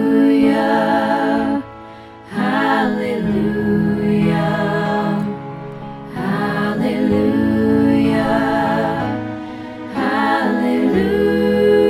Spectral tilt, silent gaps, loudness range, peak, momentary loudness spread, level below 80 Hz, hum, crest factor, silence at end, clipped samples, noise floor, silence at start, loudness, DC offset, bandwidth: -7.5 dB/octave; none; 2 LU; -4 dBFS; 14 LU; -44 dBFS; none; 14 dB; 0 s; under 0.1%; -37 dBFS; 0 s; -17 LUFS; under 0.1%; 14 kHz